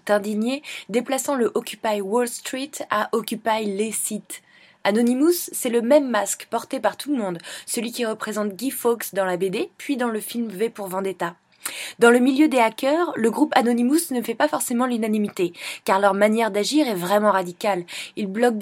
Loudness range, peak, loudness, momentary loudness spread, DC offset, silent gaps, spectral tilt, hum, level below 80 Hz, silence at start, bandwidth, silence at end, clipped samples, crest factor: 5 LU; 0 dBFS; -22 LUFS; 10 LU; under 0.1%; none; -4 dB/octave; none; -78 dBFS; 0.05 s; 16.5 kHz; 0 s; under 0.1%; 22 dB